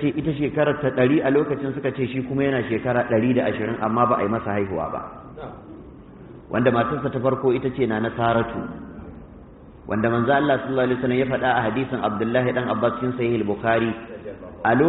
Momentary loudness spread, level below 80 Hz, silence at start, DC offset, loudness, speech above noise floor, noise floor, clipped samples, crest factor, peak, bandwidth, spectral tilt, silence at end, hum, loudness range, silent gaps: 18 LU; -50 dBFS; 0 s; under 0.1%; -22 LUFS; 22 dB; -44 dBFS; under 0.1%; 18 dB; -6 dBFS; 4.1 kHz; -5.5 dB/octave; 0 s; none; 3 LU; none